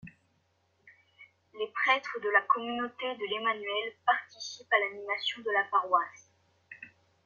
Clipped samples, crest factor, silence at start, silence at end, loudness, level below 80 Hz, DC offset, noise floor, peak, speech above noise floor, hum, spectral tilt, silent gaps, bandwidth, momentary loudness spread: under 0.1%; 22 dB; 0.05 s; 0.4 s; -30 LUFS; -80 dBFS; under 0.1%; -73 dBFS; -10 dBFS; 42 dB; none; -2 dB/octave; none; 7.2 kHz; 14 LU